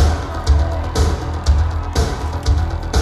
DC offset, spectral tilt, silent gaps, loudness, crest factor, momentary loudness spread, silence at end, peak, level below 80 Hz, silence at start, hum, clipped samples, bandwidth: under 0.1%; -5.5 dB/octave; none; -19 LUFS; 14 dB; 4 LU; 0 s; -2 dBFS; -18 dBFS; 0 s; none; under 0.1%; 12 kHz